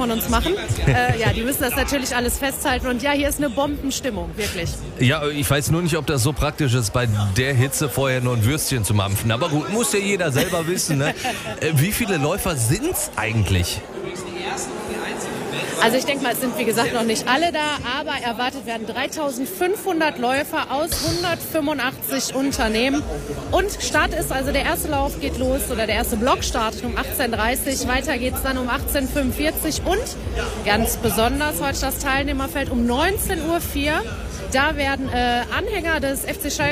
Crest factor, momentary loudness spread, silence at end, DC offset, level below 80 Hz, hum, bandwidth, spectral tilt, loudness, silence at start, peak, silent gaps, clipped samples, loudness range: 18 dB; 6 LU; 0 s; under 0.1%; -34 dBFS; none; 16 kHz; -4 dB/octave; -21 LUFS; 0 s; -4 dBFS; none; under 0.1%; 2 LU